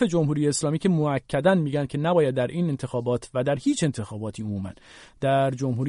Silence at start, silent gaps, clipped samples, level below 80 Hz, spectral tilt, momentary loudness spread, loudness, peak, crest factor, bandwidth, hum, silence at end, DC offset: 0 s; none; under 0.1%; -56 dBFS; -6 dB/octave; 10 LU; -25 LUFS; -6 dBFS; 18 dB; 11 kHz; none; 0 s; under 0.1%